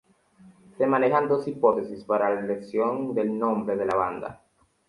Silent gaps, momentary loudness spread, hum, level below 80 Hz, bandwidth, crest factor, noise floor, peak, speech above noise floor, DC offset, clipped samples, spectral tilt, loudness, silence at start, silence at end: none; 7 LU; none; -64 dBFS; 11.5 kHz; 18 dB; -55 dBFS; -8 dBFS; 30 dB; under 0.1%; under 0.1%; -8 dB/octave; -25 LUFS; 0.45 s; 0.55 s